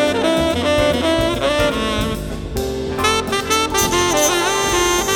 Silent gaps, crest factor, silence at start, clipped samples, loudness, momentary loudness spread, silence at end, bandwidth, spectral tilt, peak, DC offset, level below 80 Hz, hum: none; 16 dB; 0 s; under 0.1%; -17 LUFS; 8 LU; 0 s; over 20 kHz; -3 dB/octave; -2 dBFS; under 0.1%; -32 dBFS; none